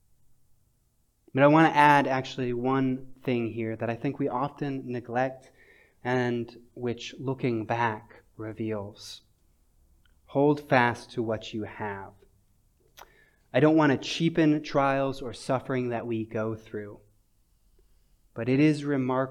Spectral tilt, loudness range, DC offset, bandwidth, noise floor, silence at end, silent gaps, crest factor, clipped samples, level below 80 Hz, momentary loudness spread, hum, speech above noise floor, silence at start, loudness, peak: -6.5 dB/octave; 9 LU; under 0.1%; 12 kHz; -69 dBFS; 0 s; none; 22 dB; under 0.1%; -60 dBFS; 16 LU; none; 42 dB; 1.35 s; -27 LUFS; -6 dBFS